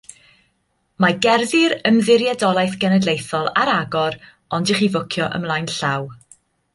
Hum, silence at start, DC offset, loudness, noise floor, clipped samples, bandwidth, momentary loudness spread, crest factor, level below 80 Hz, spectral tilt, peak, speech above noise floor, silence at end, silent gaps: none; 1 s; under 0.1%; -18 LUFS; -67 dBFS; under 0.1%; 11.5 kHz; 8 LU; 18 dB; -58 dBFS; -5 dB/octave; -2 dBFS; 49 dB; 0.6 s; none